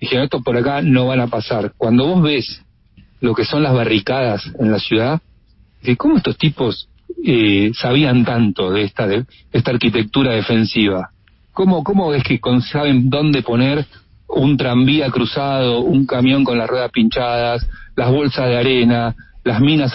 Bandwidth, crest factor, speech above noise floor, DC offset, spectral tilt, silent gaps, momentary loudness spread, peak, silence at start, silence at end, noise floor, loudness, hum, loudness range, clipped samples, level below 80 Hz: 5.8 kHz; 16 dB; 35 dB; under 0.1%; -10.5 dB/octave; none; 8 LU; 0 dBFS; 0 s; 0 s; -50 dBFS; -16 LUFS; none; 2 LU; under 0.1%; -40 dBFS